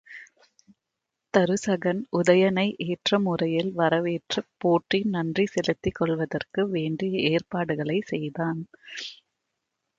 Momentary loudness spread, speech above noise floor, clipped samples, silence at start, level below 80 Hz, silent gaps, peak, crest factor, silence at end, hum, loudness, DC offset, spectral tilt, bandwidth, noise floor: 8 LU; 59 dB; under 0.1%; 0.1 s; -58 dBFS; none; -6 dBFS; 20 dB; 0.85 s; none; -25 LUFS; under 0.1%; -6 dB/octave; 8.8 kHz; -84 dBFS